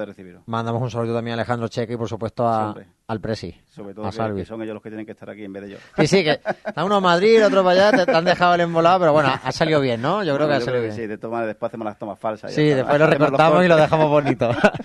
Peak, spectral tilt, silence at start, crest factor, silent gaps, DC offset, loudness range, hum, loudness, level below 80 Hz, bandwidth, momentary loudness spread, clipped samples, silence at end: 0 dBFS; -6 dB/octave; 0 s; 18 dB; none; under 0.1%; 10 LU; none; -19 LUFS; -54 dBFS; 11.5 kHz; 16 LU; under 0.1%; 0 s